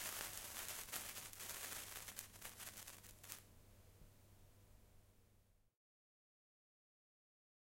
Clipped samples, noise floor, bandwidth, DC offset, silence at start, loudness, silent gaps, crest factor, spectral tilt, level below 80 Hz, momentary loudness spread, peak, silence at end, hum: under 0.1%; -74 dBFS; 16.5 kHz; under 0.1%; 0 s; -50 LUFS; none; 34 dB; -0.5 dB/octave; -72 dBFS; 21 LU; -22 dBFS; 1.95 s; none